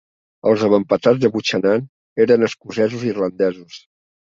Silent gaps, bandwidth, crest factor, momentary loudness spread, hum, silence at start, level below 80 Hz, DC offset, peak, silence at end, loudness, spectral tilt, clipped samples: 1.89-2.16 s; 7.6 kHz; 16 dB; 7 LU; none; 0.45 s; -60 dBFS; under 0.1%; -2 dBFS; 0.55 s; -18 LUFS; -6 dB/octave; under 0.1%